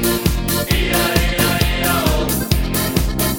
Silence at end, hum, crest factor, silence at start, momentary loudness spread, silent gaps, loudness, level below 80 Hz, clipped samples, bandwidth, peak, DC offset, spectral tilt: 0 s; none; 16 dB; 0 s; 3 LU; none; -17 LUFS; -22 dBFS; under 0.1%; 17.5 kHz; 0 dBFS; under 0.1%; -4 dB/octave